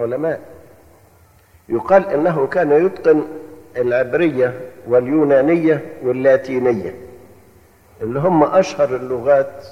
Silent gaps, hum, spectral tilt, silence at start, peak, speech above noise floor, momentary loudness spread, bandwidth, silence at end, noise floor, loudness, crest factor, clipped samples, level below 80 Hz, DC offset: none; none; -7.5 dB/octave; 0 s; -2 dBFS; 34 dB; 13 LU; 14 kHz; 0 s; -50 dBFS; -16 LUFS; 16 dB; under 0.1%; -54 dBFS; under 0.1%